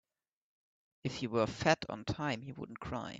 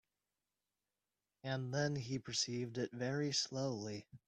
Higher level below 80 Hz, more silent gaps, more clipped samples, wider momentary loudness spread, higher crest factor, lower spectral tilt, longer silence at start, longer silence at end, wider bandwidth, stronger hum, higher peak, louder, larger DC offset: first, -62 dBFS vs -76 dBFS; neither; neither; first, 12 LU vs 7 LU; first, 24 dB vs 18 dB; about the same, -5 dB/octave vs -4 dB/octave; second, 1.05 s vs 1.45 s; about the same, 0 s vs 0.1 s; second, 8.4 kHz vs 10 kHz; second, none vs 50 Hz at -65 dBFS; first, -14 dBFS vs -24 dBFS; first, -36 LUFS vs -40 LUFS; neither